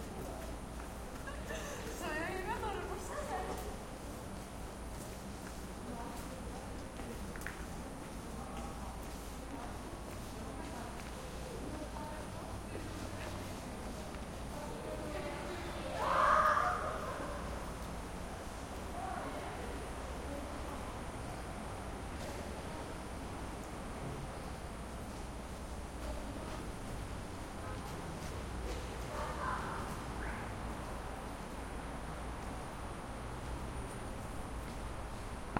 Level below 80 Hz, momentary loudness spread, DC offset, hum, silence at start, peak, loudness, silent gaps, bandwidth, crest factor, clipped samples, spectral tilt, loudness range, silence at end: -48 dBFS; 7 LU; under 0.1%; none; 0 s; -14 dBFS; -42 LUFS; none; 16.5 kHz; 26 dB; under 0.1%; -5 dB/octave; 10 LU; 0 s